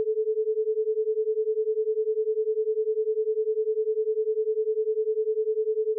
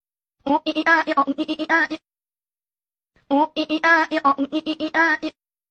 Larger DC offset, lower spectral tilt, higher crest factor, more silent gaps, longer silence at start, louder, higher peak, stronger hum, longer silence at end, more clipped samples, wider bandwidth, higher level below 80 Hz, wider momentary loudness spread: neither; second, 0.5 dB/octave vs -3.5 dB/octave; second, 6 dB vs 18 dB; neither; second, 0 s vs 0.45 s; second, -27 LUFS vs -20 LUFS; second, -20 dBFS vs -4 dBFS; neither; second, 0 s vs 0.4 s; neither; second, 0.5 kHz vs 8.4 kHz; second, under -90 dBFS vs -64 dBFS; second, 0 LU vs 8 LU